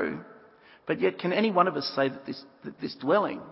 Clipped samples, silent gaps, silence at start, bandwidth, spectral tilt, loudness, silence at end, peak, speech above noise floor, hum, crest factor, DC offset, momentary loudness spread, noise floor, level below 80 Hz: under 0.1%; none; 0 s; 5.8 kHz; -9 dB/octave; -27 LUFS; 0 s; -8 dBFS; 27 dB; none; 20 dB; under 0.1%; 16 LU; -55 dBFS; -72 dBFS